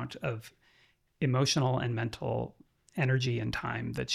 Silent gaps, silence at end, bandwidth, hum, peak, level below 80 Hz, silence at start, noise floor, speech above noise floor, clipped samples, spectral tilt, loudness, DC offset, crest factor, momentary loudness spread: none; 0 s; 13.5 kHz; none; -14 dBFS; -58 dBFS; 0 s; -67 dBFS; 36 dB; under 0.1%; -5 dB/octave; -32 LUFS; under 0.1%; 18 dB; 10 LU